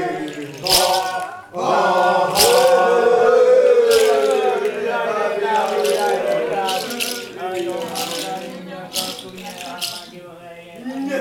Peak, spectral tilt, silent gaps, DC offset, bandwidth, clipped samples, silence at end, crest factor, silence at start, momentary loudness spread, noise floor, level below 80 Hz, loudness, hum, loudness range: 0 dBFS; -2 dB/octave; none; under 0.1%; 19 kHz; under 0.1%; 0 s; 18 dB; 0 s; 18 LU; -38 dBFS; -54 dBFS; -17 LUFS; none; 12 LU